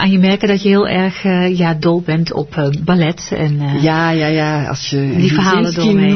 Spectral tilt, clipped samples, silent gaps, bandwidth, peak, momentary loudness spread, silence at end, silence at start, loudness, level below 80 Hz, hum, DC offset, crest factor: -6.5 dB/octave; under 0.1%; none; 6.4 kHz; -2 dBFS; 5 LU; 0 s; 0 s; -14 LUFS; -44 dBFS; none; 0.3%; 12 dB